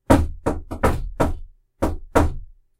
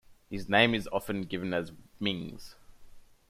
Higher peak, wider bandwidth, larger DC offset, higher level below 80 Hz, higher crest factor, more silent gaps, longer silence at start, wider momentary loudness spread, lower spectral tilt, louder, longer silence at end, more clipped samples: first, 0 dBFS vs -8 dBFS; about the same, 16 kHz vs 16 kHz; neither; first, -28 dBFS vs -56 dBFS; about the same, 22 dB vs 24 dB; neither; about the same, 0.1 s vs 0.1 s; second, 9 LU vs 19 LU; first, -7 dB/octave vs -5.5 dB/octave; first, -23 LUFS vs -30 LUFS; about the same, 0.35 s vs 0.3 s; neither